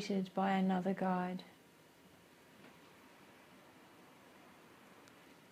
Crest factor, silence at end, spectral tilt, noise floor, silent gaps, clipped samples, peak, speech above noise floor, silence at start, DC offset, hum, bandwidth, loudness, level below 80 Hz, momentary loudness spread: 20 dB; 0.2 s; -7 dB/octave; -64 dBFS; none; under 0.1%; -22 dBFS; 28 dB; 0 s; under 0.1%; none; 14.5 kHz; -37 LUFS; -82 dBFS; 26 LU